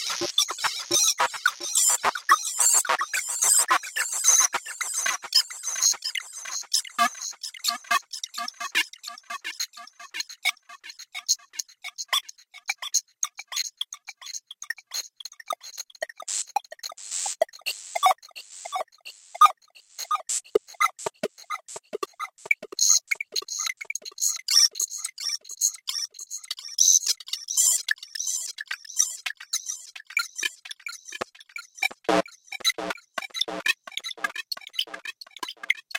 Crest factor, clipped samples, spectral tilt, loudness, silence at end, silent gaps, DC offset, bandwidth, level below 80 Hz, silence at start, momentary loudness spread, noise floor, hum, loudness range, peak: 22 dB; under 0.1%; 1.5 dB/octave; -24 LUFS; 0 s; none; under 0.1%; 16.5 kHz; -74 dBFS; 0 s; 18 LU; -48 dBFS; none; 10 LU; -4 dBFS